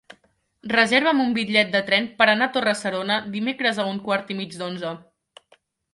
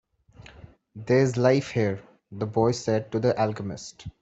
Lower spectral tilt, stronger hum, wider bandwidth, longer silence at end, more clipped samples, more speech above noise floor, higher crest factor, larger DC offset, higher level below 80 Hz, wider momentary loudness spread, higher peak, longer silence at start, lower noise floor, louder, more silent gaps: second, -4 dB/octave vs -6.5 dB/octave; neither; first, 11.5 kHz vs 8.2 kHz; first, 0.95 s vs 0.1 s; neither; first, 41 dB vs 26 dB; about the same, 20 dB vs 20 dB; neither; second, -68 dBFS vs -58 dBFS; second, 13 LU vs 16 LU; first, -2 dBFS vs -6 dBFS; first, 0.65 s vs 0.4 s; first, -63 dBFS vs -51 dBFS; first, -21 LUFS vs -25 LUFS; neither